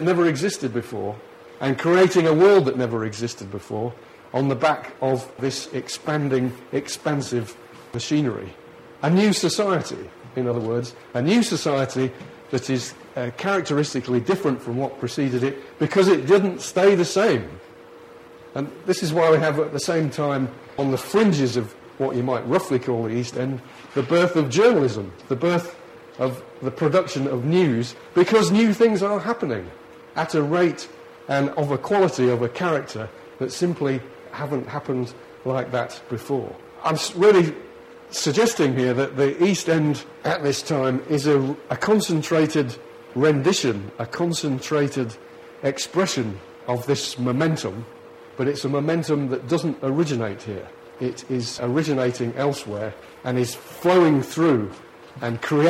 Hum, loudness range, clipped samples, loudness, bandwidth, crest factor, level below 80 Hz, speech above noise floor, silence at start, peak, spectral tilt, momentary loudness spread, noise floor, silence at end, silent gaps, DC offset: none; 5 LU; under 0.1%; -22 LUFS; 15.5 kHz; 18 dB; -62 dBFS; 23 dB; 0 s; -4 dBFS; -5.5 dB/octave; 14 LU; -44 dBFS; 0 s; none; under 0.1%